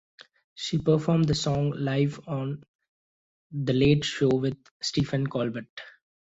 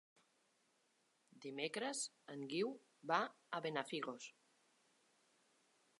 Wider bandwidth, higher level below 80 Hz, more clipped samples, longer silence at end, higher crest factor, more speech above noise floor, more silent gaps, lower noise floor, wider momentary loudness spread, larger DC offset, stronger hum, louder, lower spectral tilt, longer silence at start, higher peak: second, 8 kHz vs 11.5 kHz; first, -54 dBFS vs under -90 dBFS; neither; second, 0.5 s vs 1.7 s; second, 18 dB vs 26 dB; first, over 64 dB vs 36 dB; first, 2.68-2.79 s, 2.88-3.50 s, 4.71-4.80 s, 5.70-5.77 s vs none; first, under -90 dBFS vs -80 dBFS; about the same, 13 LU vs 14 LU; neither; neither; first, -26 LUFS vs -44 LUFS; first, -6 dB/octave vs -3 dB/octave; second, 0.55 s vs 1.35 s; first, -8 dBFS vs -22 dBFS